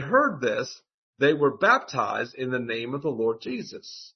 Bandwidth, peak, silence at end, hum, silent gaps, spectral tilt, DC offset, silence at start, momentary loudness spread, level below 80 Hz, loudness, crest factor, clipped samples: 6.4 kHz; -6 dBFS; 0.05 s; none; 0.94-1.13 s; -5 dB/octave; under 0.1%; 0 s; 13 LU; -72 dBFS; -25 LUFS; 20 dB; under 0.1%